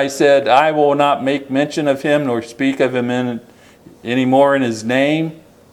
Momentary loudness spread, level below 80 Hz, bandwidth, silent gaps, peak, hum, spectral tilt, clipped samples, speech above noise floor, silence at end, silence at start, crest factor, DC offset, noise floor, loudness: 9 LU; -62 dBFS; 14 kHz; none; 0 dBFS; none; -5.5 dB/octave; under 0.1%; 29 dB; 0.35 s; 0 s; 16 dB; under 0.1%; -44 dBFS; -16 LUFS